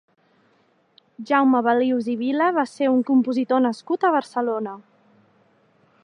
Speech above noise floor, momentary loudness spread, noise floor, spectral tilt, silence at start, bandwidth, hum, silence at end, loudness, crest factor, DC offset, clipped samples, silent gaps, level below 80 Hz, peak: 42 dB; 8 LU; -62 dBFS; -6 dB/octave; 1.2 s; 10 kHz; none; 1.25 s; -21 LUFS; 18 dB; under 0.1%; under 0.1%; none; -82 dBFS; -4 dBFS